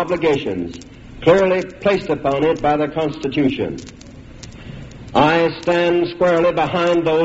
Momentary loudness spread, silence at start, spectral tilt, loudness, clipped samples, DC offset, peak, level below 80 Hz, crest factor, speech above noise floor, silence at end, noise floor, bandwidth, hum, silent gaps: 20 LU; 0 s; -4.5 dB/octave; -17 LUFS; under 0.1%; under 0.1%; 0 dBFS; -44 dBFS; 18 dB; 20 dB; 0 s; -37 dBFS; 8 kHz; none; none